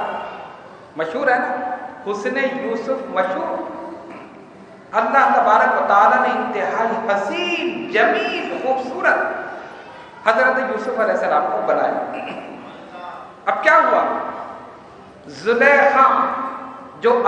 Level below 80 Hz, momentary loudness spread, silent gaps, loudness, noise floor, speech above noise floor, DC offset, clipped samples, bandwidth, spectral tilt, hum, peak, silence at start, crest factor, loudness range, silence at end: -66 dBFS; 21 LU; none; -18 LUFS; -41 dBFS; 24 dB; under 0.1%; under 0.1%; 9.6 kHz; -4.5 dB/octave; none; 0 dBFS; 0 s; 20 dB; 6 LU; 0 s